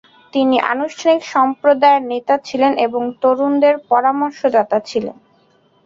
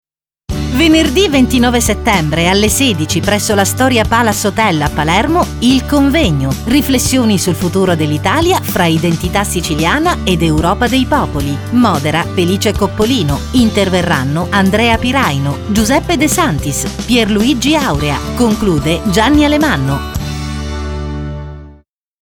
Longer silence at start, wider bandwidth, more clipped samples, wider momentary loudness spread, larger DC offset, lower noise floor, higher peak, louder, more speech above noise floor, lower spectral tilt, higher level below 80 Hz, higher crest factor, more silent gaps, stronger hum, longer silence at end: second, 0.35 s vs 0.5 s; second, 7.6 kHz vs over 20 kHz; neither; about the same, 6 LU vs 7 LU; neither; first, -55 dBFS vs -44 dBFS; about the same, -2 dBFS vs 0 dBFS; second, -16 LUFS vs -12 LUFS; first, 40 dB vs 33 dB; about the same, -4.5 dB/octave vs -4.5 dB/octave; second, -62 dBFS vs -26 dBFS; about the same, 14 dB vs 12 dB; neither; neither; first, 0.75 s vs 0.5 s